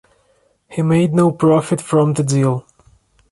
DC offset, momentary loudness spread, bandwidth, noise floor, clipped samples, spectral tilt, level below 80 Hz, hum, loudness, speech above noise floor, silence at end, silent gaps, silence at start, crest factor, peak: under 0.1%; 8 LU; 11.5 kHz; -59 dBFS; under 0.1%; -7 dB/octave; -54 dBFS; none; -16 LUFS; 45 dB; 0.7 s; none; 0.7 s; 14 dB; -2 dBFS